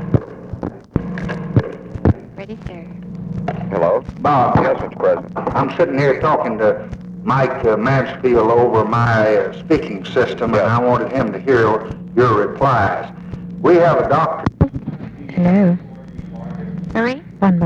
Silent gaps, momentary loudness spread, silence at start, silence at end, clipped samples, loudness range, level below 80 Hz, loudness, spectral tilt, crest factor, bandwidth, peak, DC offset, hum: none; 16 LU; 0 s; 0 s; under 0.1%; 4 LU; -38 dBFS; -17 LUFS; -8.5 dB/octave; 16 dB; 7.8 kHz; 0 dBFS; under 0.1%; none